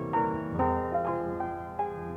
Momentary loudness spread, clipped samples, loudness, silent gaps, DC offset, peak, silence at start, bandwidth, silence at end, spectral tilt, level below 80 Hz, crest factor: 6 LU; under 0.1%; -31 LUFS; none; under 0.1%; -16 dBFS; 0 s; 10.5 kHz; 0 s; -9.5 dB/octave; -50 dBFS; 14 dB